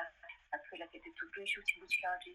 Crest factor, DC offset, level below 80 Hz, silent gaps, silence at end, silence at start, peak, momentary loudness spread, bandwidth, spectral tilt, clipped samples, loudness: 22 dB; under 0.1%; -74 dBFS; none; 0 s; 0 s; -20 dBFS; 14 LU; 15 kHz; -0.5 dB/octave; under 0.1%; -39 LUFS